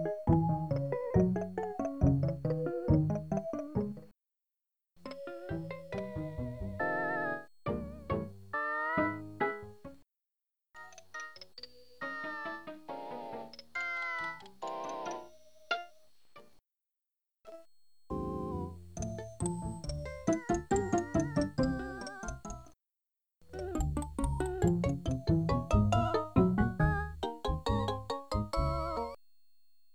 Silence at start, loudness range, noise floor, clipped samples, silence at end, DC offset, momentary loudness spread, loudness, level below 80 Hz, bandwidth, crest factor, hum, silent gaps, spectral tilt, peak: 0 s; 12 LU; -90 dBFS; under 0.1%; 0.8 s; 0.1%; 16 LU; -35 LUFS; -46 dBFS; 12.5 kHz; 22 dB; none; none; -6.5 dB/octave; -12 dBFS